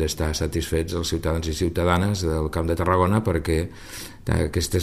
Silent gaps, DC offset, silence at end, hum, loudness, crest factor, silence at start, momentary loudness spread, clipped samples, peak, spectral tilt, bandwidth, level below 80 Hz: none; 0.4%; 0 s; none; -24 LUFS; 16 dB; 0 s; 6 LU; under 0.1%; -6 dBFS; -5.5 dB/octave; 15.5 kHz; -34 dBFS